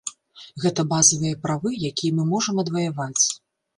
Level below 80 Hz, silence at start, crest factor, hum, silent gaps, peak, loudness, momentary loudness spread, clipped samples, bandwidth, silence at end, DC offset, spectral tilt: -60 dBFS; 0.05 s; 22 dB; none; none; 0 dBFS; -21 LUFS; 10 LU; under 0.1%; 11.5 kHz; 0.4 s; under 0.1%; -3.5 dB/octave